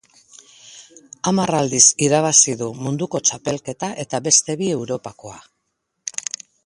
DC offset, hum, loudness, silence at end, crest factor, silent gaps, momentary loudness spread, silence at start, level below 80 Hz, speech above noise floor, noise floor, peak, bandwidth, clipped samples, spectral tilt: under 0.1%; none; -17 LUFS; 0.45 s; 20 dB; none; 17 LU; 0.65 s; -60 dBFS; 55 dB; -74 dBFS; 0 dBFS; 11.5 kHz; under 0.1%; -3 dB/octave